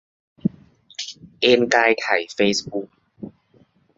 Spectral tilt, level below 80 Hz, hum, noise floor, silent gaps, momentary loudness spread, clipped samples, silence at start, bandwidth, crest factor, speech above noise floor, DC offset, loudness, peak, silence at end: -3.5 dB/octave; -62 dBFS; none; -58 dBFS; none; 24 LU; under 0.1%; 0.45 s; 8 kHz; 22 dB; 39 dB; under 0.1%; -20 LUFS; -2 dBFS; 0.7 s